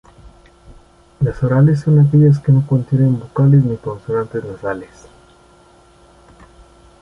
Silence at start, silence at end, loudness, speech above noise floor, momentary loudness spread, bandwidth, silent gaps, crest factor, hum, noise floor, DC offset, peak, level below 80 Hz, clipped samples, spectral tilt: 1.2 s; 2.15 s; -15 LUFS; 34 dB; 13 LU; 5.8 kHz; none; 14 dB; none; -48 dBFS; under 0.1%; -2 dBFS; -44 dBFS; under 0.1%; -10.5 dB/octave